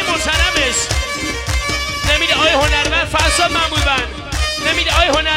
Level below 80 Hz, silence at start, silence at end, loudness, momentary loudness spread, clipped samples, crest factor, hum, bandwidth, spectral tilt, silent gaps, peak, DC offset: -24 dBFS; 0 s; 0 s; -14 LUFS; 7 LU; under 0.1%; 14 dB; none; 16.5 kHz; -2.5 dB/octave; none; 0 dBFS; under 0.1%